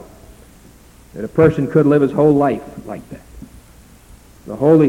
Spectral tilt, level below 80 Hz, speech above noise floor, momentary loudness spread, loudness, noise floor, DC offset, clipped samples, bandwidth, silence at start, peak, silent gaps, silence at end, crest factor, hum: -9 dB/octave; -44 dBFS; 30 dB; 21 LU; -15 LUFS; -44 dBFS; under 0.1%; under 0.1%; 16 kHz; 1.15 s; -2 dBFS; none; 0 s; 16 dB; none